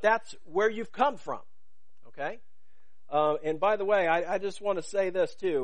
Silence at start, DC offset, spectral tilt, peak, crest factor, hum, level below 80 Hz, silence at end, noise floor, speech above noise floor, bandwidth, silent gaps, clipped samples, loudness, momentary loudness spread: 0.05 s; 1%; -4.5 dB/octave; -10 dBFS; 18 dB; none; -72 dBFS; 0 s; -77 dBFS; 49 dB; 10 kHz; none; under 0.1%; -29 LUFS; 12 LU